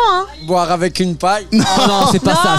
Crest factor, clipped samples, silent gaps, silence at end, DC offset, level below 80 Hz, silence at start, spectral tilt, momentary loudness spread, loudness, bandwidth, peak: 12 dB; under 0.1%; none; 0 s; under 0.1%; -40 dBFS; 0 s; -4.5 dB/octave; 5 LU; -14 LUFS; 15.5 kHz; -2 dBFS